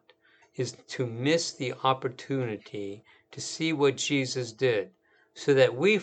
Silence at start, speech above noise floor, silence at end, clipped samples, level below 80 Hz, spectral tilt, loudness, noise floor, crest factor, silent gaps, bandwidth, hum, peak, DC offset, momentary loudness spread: 0.6 s; 34 dB; 0 s; under 0.1%; -78 dBFS; -4.5 dB/octave; -28 LUFS; -62 dBFS; 22 dB; none; 9.2 kHz; none; -6 dBFS; under 0.1%; 15 LU